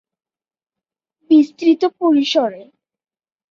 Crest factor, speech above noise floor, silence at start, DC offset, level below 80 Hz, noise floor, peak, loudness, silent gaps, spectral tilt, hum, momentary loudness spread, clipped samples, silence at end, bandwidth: 16 dB; over 74 dB; 1.3 s; under 0.1%; -68 dBFS; under -90 dBFS; -2 dBFS; -15 LUFS; none; -4 dB/octave; none; 5 LU; under 0.1%; 0.9 s; 7.2 kHz